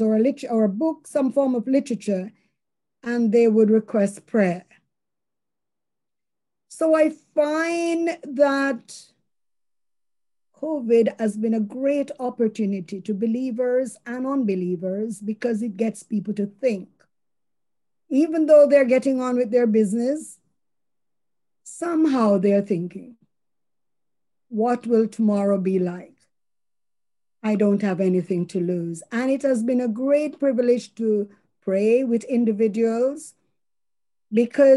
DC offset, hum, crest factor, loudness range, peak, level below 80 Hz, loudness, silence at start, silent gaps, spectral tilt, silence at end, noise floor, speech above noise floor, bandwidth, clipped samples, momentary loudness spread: under 0.1%; none; 18 dB; 6 LU; -6 dBFS; -74 dBFS; -22 LUFS; 0 s; none; -7 dB/octave; 0 s; under -90 dBFS; over 69 dB; 12 kHz; under 0.1%; 10 LU